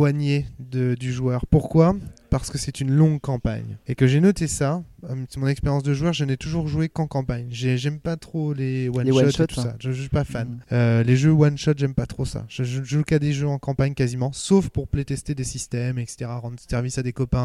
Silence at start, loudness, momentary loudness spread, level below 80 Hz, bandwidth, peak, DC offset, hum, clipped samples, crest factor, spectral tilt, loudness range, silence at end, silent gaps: 0 s; -23 LUFS; 10 LU; -40 dBFS; 12.5 kHz; -4 dBFS; under 0.1%; none; under 0.1%; 18 dB; -6.5 dB/octave; 4 LU; 0 s; none